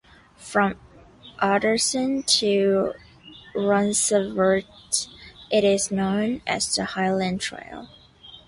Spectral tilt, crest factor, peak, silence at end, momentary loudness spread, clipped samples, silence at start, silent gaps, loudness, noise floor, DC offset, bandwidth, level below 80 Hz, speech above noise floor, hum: -3.5 dB/octave; 18 dB; -6 dBFS; 0.1 s; 14 LU; under 0.1%; 0.4 s; none; -23 LUFS; -48 dBFS; under 0.1%; 11.5 kHz; -56 dBFS; 26 dB; none